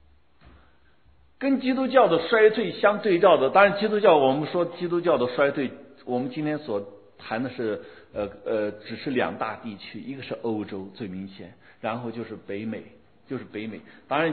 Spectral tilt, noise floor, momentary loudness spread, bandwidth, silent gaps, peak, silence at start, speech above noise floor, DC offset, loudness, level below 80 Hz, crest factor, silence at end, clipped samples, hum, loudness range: -9.5 dB/octave; -60 dBFS; 18 LU; 4.5 kHz; none; -4 dBFS; 1.4 s; 36 dB; 0.1%; -24 LUFS; -64 dBFS; 22 dB; 0 s; under 0.1%; none; 14 LU